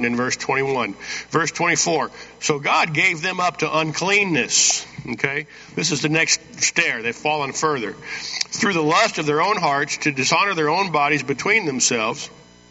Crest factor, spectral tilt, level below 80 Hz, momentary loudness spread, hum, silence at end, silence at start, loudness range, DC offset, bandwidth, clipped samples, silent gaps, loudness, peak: 20 dB; -2.5 dB/octave; -60 dBFS; 9 LU; none; 0.4 s; 0 s; 2 LU; under 0.1%; 8.2 kHz; under 0.1%; none; -19 LUFS; -2 dBFS